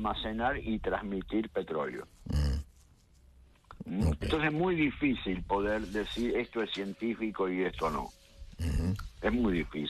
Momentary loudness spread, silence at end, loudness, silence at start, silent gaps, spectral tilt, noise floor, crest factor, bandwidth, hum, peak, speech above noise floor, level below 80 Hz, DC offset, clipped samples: 10 LU; 0 s; -33 LUFS; 0 s; none; -6.5 dB/octave; -61 dBFS; 16 dB; 13 kHz; none; -16 dBFS; 29 dB; -42 dBFS; under 0.1%; under 0.1%